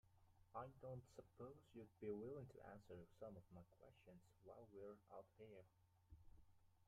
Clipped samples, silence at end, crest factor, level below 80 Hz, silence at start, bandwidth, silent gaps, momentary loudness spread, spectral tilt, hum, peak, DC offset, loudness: under 0.1%; 0.05 s; 20 dB; -80 dBFS; 0.05 s; 10 kHz; none; 13 LU; -8 dB/octave; none; -40 dBFS; under 0.1%; -60 LUFS